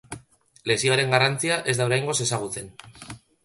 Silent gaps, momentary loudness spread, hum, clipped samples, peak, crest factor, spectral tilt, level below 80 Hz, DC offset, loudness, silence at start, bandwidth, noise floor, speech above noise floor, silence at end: none; 22 LU; none; under 0.1%; -4 dBFS; 22 dB; -3.5 dB/octave; -58 dBFS; under 0.1%; -23 LUFS; 0.1 s; 12 kHz; -52 dBFS; 28 dB; 0.3 s